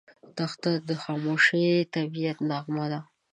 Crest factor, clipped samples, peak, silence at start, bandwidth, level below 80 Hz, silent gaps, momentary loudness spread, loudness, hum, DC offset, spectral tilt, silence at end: 18 dB; under 0.1%; -8 dBFS; 0.25 s; 9.6 kHz; -76 dBFS; none; 12 LU; -27 LUFS; none; under 0.1%; -6 dB/octave; 0.3 s